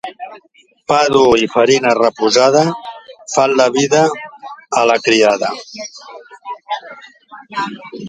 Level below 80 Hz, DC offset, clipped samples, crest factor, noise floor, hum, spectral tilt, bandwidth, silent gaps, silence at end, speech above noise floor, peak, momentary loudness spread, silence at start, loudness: -54 dBFS; under 0.1%; under 0.1%; 16 dB; -51 dBFS; none; -3.5 dB/octave; 9.6 kHz; none; 0 s; 39 dB; 0 dBFS; 21 LU; 0.05 s; -13 LUFS